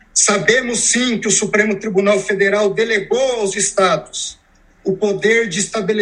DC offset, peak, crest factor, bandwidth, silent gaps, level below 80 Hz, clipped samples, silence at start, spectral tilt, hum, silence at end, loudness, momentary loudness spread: under 0.1%; 0 dBFS; 16 dB; 11 kHz; none; -52 dBFS; under 0.1%; 0.15 s; -2.5 dB/octave; none; 0 s; -15 LUFS; 6 LU